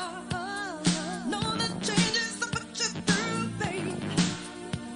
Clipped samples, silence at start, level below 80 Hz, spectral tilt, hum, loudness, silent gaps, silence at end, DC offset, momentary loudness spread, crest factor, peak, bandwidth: under 0.1%; 0 s; -56 dBFS; -3.5 dB/octave; none; -29 LUFS; none; 0 s; under 0.1%; 8 LU; 20 dB; -10 dBFS; 11 kHz